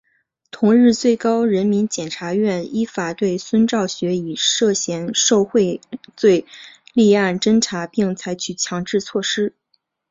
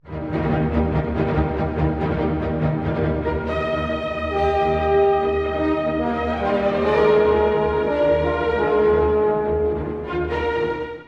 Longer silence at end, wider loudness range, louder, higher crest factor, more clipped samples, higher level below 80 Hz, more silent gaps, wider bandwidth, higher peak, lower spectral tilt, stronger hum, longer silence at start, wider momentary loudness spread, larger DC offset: first, 0.6 s vs 0.05 s; about the same, 2 LU vs 4 LU; first, -18 LUFS vs -21 LUFS; about the same, 16 dB vs 14 dB; neither; second, -60 dBFS vs -34 dBFS; neither; first, 7.8 kHz vs 6.6 kHz; about the same, -2 dBFS vs -4 dBFS; second, -4 dB/octave vs -8.5 dB/octave; neither; first, 0.55 s vs 0.05 s; about the same, 8 LU vs 6 LU; neither